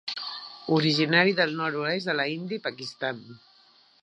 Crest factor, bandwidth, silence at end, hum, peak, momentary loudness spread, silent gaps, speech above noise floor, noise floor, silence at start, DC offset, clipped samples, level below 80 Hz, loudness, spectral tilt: 22 dB; 10.5 kHz; 0.65 s; none; -6 dBFS; 13 LU; none; 33 dB; -59 dBFS; 0.05 s; under 0.1%; under 0.1%; -76 dBFS; -26 LUFS; -5.5 dB/octave